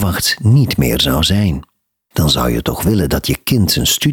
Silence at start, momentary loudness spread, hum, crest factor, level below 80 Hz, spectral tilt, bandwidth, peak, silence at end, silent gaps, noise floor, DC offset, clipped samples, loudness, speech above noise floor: 0 s; 5 LU; none; 12 dB; -28 dBFS; -4.5 dB/octave; 20 kHz; -2 dBFS; 0 s; none; -36 dBFS; under 0.1%; under 0.1%; -14 LUFS; 22 dB